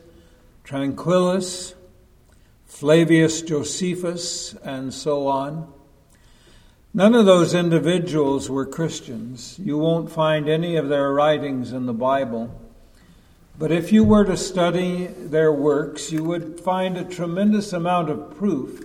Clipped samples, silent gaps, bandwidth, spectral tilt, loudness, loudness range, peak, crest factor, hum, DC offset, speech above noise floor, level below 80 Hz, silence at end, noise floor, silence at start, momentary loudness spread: under 0.1%; none; 14.5 kHz; -5.5 dB/octave; -21 LUFS; 4 LU; 0 dBFS; 20 dB; none; under 0.1%; 33 dB; -48 dBFS; 0 s; -53 dBFS; 0.65 s; 14 LU